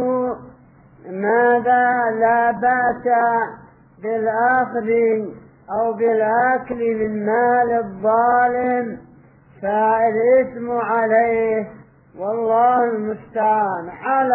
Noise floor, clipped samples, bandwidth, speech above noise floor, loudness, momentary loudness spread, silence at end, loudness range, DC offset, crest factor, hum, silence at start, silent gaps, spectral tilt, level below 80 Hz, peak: -48 dBFS; under 0.1%; 3.4 kHz; 30 dB; -18 LUFS; 10 LU; 0 s; 2 LU; under 0.1%; 12 dB; none; 0 s; none; -11 dB/octave; -58 dBFS; -6 dBFS